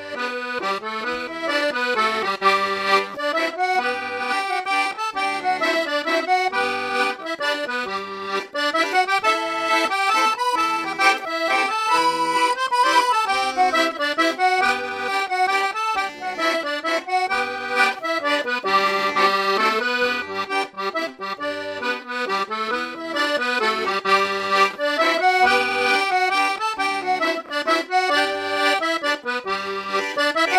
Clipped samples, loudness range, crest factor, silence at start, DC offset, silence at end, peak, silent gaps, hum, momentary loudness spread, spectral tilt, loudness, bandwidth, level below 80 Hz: under 0.1%; 3 LU; 18 dB; 0 s; under 0.1%; 0 s; -4 dBFS; none; none; 7 LU; -2 dB/octave; -21 LUFS; 16 kHz; -64 dBFS